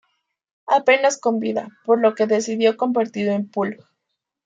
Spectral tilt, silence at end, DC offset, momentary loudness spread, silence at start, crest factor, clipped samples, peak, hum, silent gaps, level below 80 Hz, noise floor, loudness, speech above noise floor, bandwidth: -4.5 dB/octave; 0.7 s; under 0.1%; 9 LU; 0.65 s; 18 dB; under 0.1%; -4 dBFS; none; none; -72 dBFS; -79 dBFS; -20 LUFS; 60 dB; 9 kHz